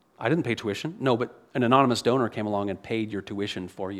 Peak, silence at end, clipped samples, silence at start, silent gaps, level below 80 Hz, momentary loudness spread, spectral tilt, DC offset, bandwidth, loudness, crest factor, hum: -4 dBFS; 0 s; under 0.1%; 0.2 s; none; -66 dBFS; 11 LU; -6 dB/octave; under 0.1%; 13.5 kHz; -26 LUFS; 22 dB; none